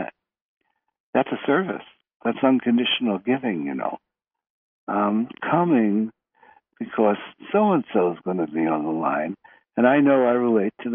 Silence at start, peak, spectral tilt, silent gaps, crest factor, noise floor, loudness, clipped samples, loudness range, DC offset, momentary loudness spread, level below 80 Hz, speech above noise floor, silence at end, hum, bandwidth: 0 s; -4 dBFS; -4.5 dB/octave; 0.42-0.61 s, 1.00-1.13 s, 2.15-2.20 s, 4.50-4.87 s; 18 dB; -56 dBFS; -22 LUFS; under 0.1%; 3 LU; under 0.1%; 12 LU; -72 dBFS; 35 dB; 0 s; none; 3.7 kHz